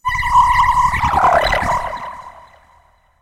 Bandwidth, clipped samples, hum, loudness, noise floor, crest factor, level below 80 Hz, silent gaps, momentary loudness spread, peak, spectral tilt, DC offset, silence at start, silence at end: 16 kHz; under 0.1%; none; -14 LUFS; -53 dBFS; 14 dB; -30 dBFS; none; 16 LU; -2 dBFS; -4 dB/octave; under 0.1%; 0.05 s; 0.85 s